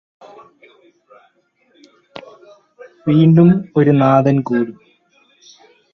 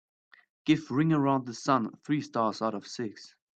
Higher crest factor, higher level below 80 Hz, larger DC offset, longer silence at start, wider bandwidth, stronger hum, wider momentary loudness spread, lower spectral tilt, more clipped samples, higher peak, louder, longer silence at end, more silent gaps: about the same, 16 dB vs 20 dB; first, -56 dBFS vs -72 dBFS; neither; first, 2.15 s vs 0.65 s; second, 6.2 kHz vs 8.8 kHz; neither; first, 25 LU vs 12 LU; first, -9.5 dB/octave vs -6.5 dB/octave; neither; first, 0 dBFS vs -10 dBFS; first, -13 LUFS vs -29 LUFS; first, 1.2 s vs 0.3 s; neither